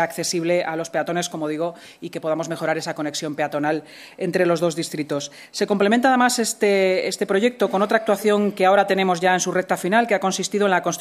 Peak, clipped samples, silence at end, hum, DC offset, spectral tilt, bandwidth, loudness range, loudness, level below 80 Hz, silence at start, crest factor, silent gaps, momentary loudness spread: -4 dBFS; under 0.1%; 0 s; none; under 0.1%; -4 dB/octave; 15.5 kHz; 6 LU; -21 LUFS; -70 dBFS; 0 s; 18 dB; none; 10 LU